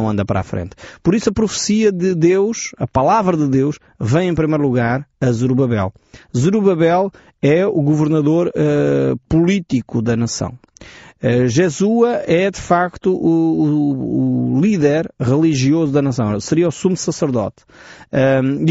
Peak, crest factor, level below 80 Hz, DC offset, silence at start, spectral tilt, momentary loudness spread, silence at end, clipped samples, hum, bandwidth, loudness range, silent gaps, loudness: -2 dBFS; 14 dB; -44 dBFS; under 0.1%; 0 s; -7 dB/octave; 7 LU; 0 s; under 0.1%; none; 8 kHz; 2 LU; none; -16 LUFS